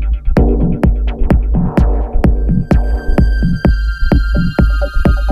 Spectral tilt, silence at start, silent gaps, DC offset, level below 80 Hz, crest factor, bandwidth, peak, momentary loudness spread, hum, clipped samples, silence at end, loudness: -9 dB/octave; 0 s; none; under 0.1%; -12 dBFS; 12 dB; 5.2 kHz; 0 dBFS; 2 LU; none; under 0.1%; 0 s; -14 LUFS